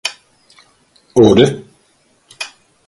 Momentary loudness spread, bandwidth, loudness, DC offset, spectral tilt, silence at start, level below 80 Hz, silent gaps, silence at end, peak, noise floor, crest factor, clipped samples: 19 LU; 11.5 kHz; -12 LUFS; under 0.1%; -5.5 dB/octave; 0.05 s; -46 dBFS; none; 0.4 s; 0 dBFS; -56 dBFS; 16 dB; under 0.1%